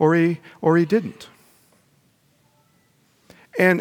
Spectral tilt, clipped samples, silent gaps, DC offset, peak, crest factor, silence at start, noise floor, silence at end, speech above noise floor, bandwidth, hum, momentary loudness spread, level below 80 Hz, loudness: -7.5 dB/octave; under 0.1%; none; under 0.1%; -2 dBFS; 20 dB; 0 s; -61 dBFS; 0 s; 42 dB; 16.5 kHz; none; 22 LU; -72 dBFS; -20 LUFS